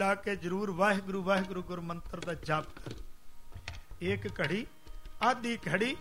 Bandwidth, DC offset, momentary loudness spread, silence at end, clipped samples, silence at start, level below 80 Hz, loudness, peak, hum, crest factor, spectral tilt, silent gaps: 16 kHz; 0.3%; 17 LU; 0 s; under 0.1%; 0 s; -52 dBFS; -33 LUFS; -14 dBFS; none; 20 dB; -5.5 dB/octave; none